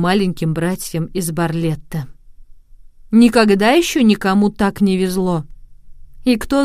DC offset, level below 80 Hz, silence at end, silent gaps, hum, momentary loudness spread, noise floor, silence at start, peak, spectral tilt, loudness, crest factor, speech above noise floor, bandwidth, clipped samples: under 0.1%; -40 dBFS; 0 s; none; none; 11 LU; -40 dBFS; 0 s; 0 dBFS; -5.5 dB/octave; -16 LUFS; 16 dB; 25 dB; 16 kHz; under 0.1%